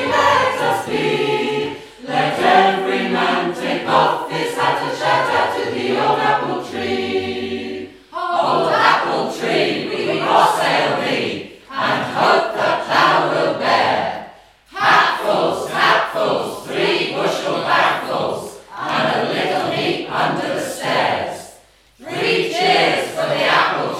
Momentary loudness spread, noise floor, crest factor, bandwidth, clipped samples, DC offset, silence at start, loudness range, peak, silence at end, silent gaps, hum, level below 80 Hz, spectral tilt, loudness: 10 LU; -48 dBFS; 18 dB; 16 kHz; under 0.1%; under 0.1%; 0 s; 3 LU; 0 dBFS; 0 s; none; none; -60 dBFS; -4 dB/octave; -17 LUFS